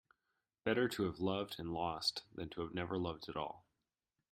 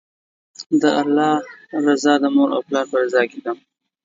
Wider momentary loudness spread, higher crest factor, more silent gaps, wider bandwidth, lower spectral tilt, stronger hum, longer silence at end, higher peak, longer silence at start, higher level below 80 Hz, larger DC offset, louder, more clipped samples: second, 10 LU vs 13 LU; first, 22 dB vs 16 dB; second, none vs 0.66-0.70 s; first, 16 kHz vs 7.8 kHz; about the same, -5 dB/octave vs -4.5 dB/octave; neither; first, 0.7 s vs 0.5 s; second, -20 dBFS vs -2 dBFS; about the same, 0.65 s vs 0.6 s; about the same, -68 dBFS vs -72 dBFS; neither; second, -40 LUFS vs -18 LUFS; neither